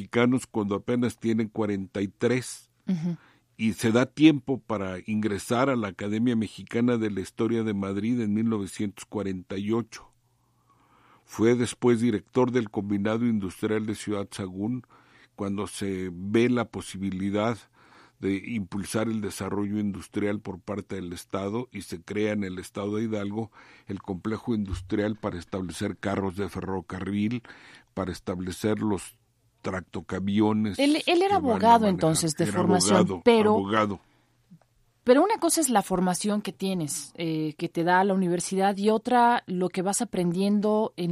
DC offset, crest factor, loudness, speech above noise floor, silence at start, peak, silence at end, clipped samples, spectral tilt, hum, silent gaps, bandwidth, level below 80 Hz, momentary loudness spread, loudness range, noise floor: under 0.1%; 22 dB; -27 LUFS; 41 dB; 0 s; -4 dBFS; 0 s; under 0.1%; -5.5 dB/octave; none; none; 15 kHz; -58 dBFS; 13 LU; 8 LU; -67 dBFS